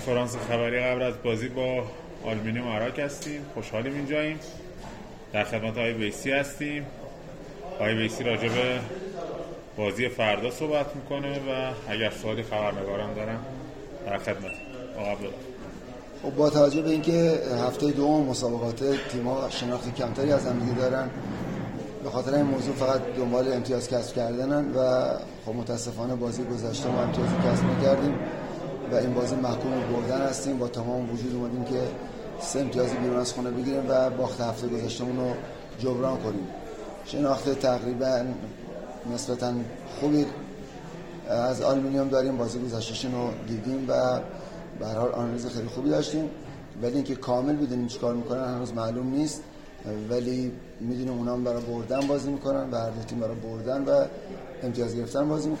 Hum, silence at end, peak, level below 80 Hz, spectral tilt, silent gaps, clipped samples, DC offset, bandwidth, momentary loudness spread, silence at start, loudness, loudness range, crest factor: none; 0 s; -8 dBFS; -50 dBFS; -6 dB/octave; none; under 0.1%; under 0.1%; 16.5 kHz; 13 LU; 0 s; -28 LUFS; 5 LU; 20 dB